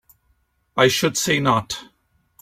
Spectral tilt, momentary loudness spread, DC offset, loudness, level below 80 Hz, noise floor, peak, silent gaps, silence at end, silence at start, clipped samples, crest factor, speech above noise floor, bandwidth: -3.5 dB/octave; 14 LU; under 0.1%; -19 LUFS; -56 dBFS; -65 dBFS; -2 dBFS; none; 0.55 s; 0.75 s; under 0.1%; 20 dB; 46 dB; 16.5 kHz